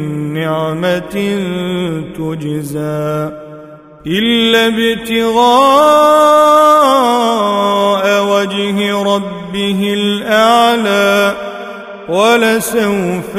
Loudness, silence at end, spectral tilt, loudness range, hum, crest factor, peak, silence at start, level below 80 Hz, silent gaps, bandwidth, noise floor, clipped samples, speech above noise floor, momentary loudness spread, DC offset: -12 LUFS; 0 s; -4.5 dB/octave; 9 LU; none; 12 dB; 0 dBFS; 0 s; -48 dBFS; none; 16 kHz; -34 dBFS; under 0.1%; 23 dB; 13 LU; under 0.1%